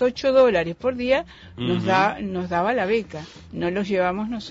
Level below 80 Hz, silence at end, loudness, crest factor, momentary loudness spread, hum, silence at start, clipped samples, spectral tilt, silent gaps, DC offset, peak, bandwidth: -50 dBFS; 0 s; -22 LUFS; 16 dB; 12 LU; none; 0 s; under 0.1%; -6.5 dB/octave; none; under 0.1%; -8 dBFS; 7.8 kHz